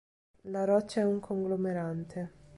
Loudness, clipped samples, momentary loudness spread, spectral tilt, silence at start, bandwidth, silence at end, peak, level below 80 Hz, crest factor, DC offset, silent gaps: -32 LUFS; under 0.1%; 12 LU; -7.5 dB/octave; 0.45 s; 11.5 kHz; 0 s; -16 dBFS; -66 dBFS; 18 dB; under 0.1%; none